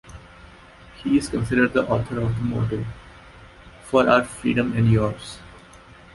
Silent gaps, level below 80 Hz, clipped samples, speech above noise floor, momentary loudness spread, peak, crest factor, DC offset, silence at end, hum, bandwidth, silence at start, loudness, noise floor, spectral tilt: none; -44 dBFS; under 0.1%; 26 dB; 17 LU; -2 dBFS; 22 dB; under 0.1%; 0.55 s; none; 11.5 kHz; 0.05 s; -22 LUFS; -47 dBFS; -7 dB/octave